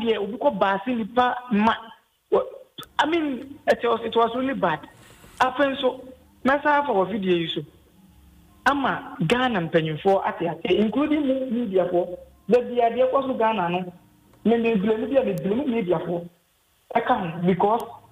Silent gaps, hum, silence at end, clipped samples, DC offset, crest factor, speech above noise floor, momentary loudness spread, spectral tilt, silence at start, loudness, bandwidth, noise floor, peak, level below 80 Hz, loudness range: none; none; 0.15 s; under 0.1%; under 0.1%; 16 dB; 41 dB; 7 LU; -6.5 dB/octave; 0 s; -23 LUFS; 15.5 kHz; -64 dBFS; -6 dBFS; -58 dBFS; 2 LU